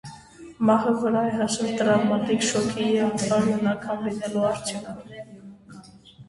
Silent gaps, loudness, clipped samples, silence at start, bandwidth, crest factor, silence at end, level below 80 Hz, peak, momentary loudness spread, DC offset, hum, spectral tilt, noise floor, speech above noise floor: none; -23 LUFS; under 0.1%; 0.05 s; 11.5 kHz; 16 dB; 0.05 s; -60 dBFS; -8 dBFS; 18 LU; under 0.1%; none; -5 dB/octave; -47 dBFS; 24 dB